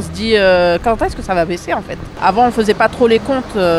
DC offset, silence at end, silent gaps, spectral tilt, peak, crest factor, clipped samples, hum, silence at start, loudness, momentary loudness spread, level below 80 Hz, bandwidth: under 0.1%; 0 s; none; -5.5 dB/octave; 0 dBFS; 14 dB; under 0.1%; none; 0 s; -14 LUFS; 8 LU; -34 dBFS; 13.5 kHz